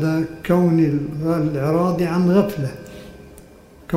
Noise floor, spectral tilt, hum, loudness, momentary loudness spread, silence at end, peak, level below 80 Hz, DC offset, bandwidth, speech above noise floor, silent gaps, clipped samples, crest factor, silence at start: -45 dBFS; -8.5 dB/octave; none; -19 LUFS; 13 LU; 0 s; -4 dBFS; -48 dBFS; under 0.1%; 15.5 kHz; 27 dB; none; under 0.1%; 16 dB; 0 s